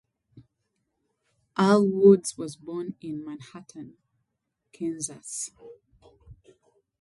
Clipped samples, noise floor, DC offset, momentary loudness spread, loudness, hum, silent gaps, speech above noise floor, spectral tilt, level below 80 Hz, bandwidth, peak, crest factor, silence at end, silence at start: under 0.1%; -81 dBFS; under 0.1%; 25 LU; -25 LUFS; none; none; 56 dB; -6 dB/octave; -66 dBFS; 11.5 kHz; -6 dBFS; 22 dB; 0.65 s; 0.35 s